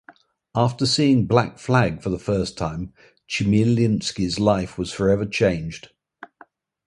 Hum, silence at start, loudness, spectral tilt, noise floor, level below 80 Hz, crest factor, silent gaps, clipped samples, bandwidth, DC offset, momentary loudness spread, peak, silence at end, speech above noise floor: none; 0.55 s; -21 LUFS; -6 dB/octave; -53 dBFS; -44 dBFS; 20 dB; none; under 0.1%; 11.5 kHz; under 0.1%; 11 LU; 0 dBFS; 1.1 s; 32 dB